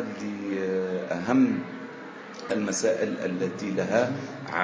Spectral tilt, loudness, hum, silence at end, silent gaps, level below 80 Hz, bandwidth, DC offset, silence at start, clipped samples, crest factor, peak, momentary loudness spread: -5 dB/octave; -27 LUFS; none; 0 s; none; -68 dBFS; 8 kHz; under 0.1%; 0 s; under 0.1%; 20 dB; -8 dBFS; 15 LU